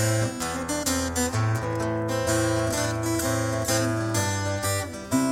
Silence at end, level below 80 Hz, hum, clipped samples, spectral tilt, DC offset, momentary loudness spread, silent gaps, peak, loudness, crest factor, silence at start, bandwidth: 0 s; -46 dBFS; none; under 0.1%; -4.5 dB/octave; under 0.1%; 3 LU; none; -10 dBFS; -26 LUFS; 14 dB; 0 s; 17 kHz